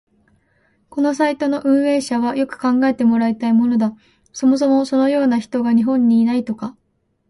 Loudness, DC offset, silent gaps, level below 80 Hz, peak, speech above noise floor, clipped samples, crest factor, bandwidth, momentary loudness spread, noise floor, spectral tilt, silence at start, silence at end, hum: -17 LUFS; under 0.1%; none; -60 dBFS; -4 dBFS; 50 dB; under 0.1%; 12 dB; 11.5 kHz; 7 LU; -66 dBFS; -6 dB/octave; 0.95 s; 0.6 s; none